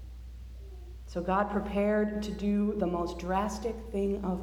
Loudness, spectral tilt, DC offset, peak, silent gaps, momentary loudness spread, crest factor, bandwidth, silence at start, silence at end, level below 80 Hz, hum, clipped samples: -31 LUFS; -7 dB/octave; under 0.1%; -14 dBFS; none; 18 LU; 18 dB; 13 kHz; 0 s; 0 s; -44 dBFS; none; under 0.1%